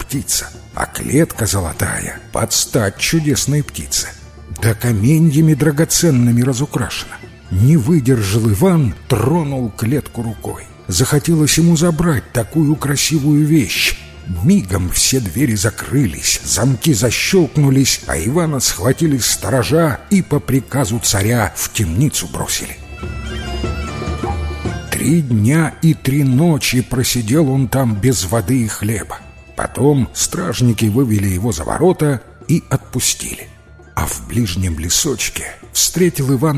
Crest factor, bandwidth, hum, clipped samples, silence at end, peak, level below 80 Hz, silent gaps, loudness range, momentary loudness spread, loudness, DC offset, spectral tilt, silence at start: 14 dB; 16 kHz; none; under 0.1%; 0 s; 0 dBFS; -32 dBFS; none; 4 LU; 10 LU; -15 LUFS; under 0.1%; -4.5 dB/octave; 0 s